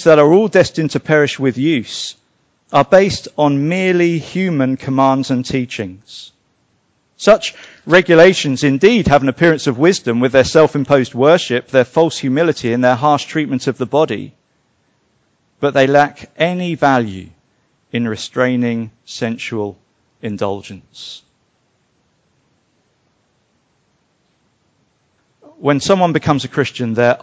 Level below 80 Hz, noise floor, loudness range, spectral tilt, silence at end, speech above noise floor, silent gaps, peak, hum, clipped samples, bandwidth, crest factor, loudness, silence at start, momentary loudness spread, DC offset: -46 dBFS; -62 dBFS; 12 LU; -5.5 dB/octave; 0.05 s; 48 dB; none; 0 dBFS; none; under 0.1%; 8 kHz; 16 dB; -14 LUFS; 0 s; 14 LU; under 0.1%